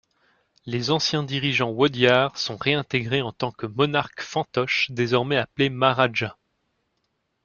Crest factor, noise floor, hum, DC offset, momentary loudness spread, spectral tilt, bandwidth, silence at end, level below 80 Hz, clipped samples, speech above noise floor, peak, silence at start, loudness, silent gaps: 22 dB; -74 dBFS; none; under 0.1%; 9 LU; -5 dB/octave; 7.2 kHz; 1.1 s; -60 dBFS; under 0.1%; 51 dB; -2 dBFS; 0.65 s; -23 LUFS; none